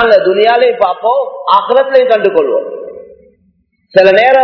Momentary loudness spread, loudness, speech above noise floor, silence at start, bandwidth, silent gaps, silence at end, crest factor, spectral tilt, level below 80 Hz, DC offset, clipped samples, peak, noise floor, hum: 9 LU; -10 LUFS; 47 dB; 0 s; 5.4 kHz; none; 0 s; 10 dB; -6 dB/octave; -54 dBFS; under 0.1%; 2%; 0 dBFS; -56 dBFS; none